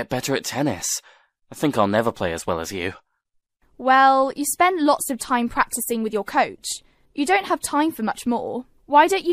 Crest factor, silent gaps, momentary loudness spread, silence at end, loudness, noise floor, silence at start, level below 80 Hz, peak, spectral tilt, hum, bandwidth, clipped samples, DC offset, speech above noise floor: 20 dB; none; 12 LU; 0 s; -21 LUFS; -71 dBFS; 0 s; -54 dBFS; -2 dBFS; -3.5 dB/octave; none; 15.5 kHz; under 0.1%; under 0.1%; 50 dB